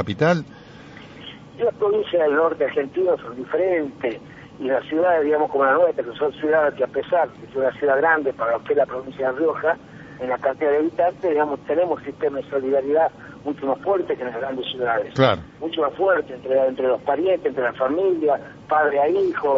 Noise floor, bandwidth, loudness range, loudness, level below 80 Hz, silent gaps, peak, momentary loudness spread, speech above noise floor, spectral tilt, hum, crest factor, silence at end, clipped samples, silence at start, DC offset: -41 dBFS; 7.2 kHz; 2 LU; -21 LUFS; -58 dBFS; none; -2 dBFS; 9 LU; 21 dB; -4 dB/octave; none; 20 dB; 0 s; under 0.1%; 0 s; under 0.1%